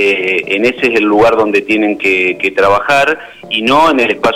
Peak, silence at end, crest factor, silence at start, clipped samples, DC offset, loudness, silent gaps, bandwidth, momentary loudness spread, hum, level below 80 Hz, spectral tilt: -2 dBFS; 0 s; 10 dB; 0 s; under 0.1%; under 0.1%; -11 LUFS; none; 16 kHz; 4 LU; none; -44 dBFS; -4.5 dB/octave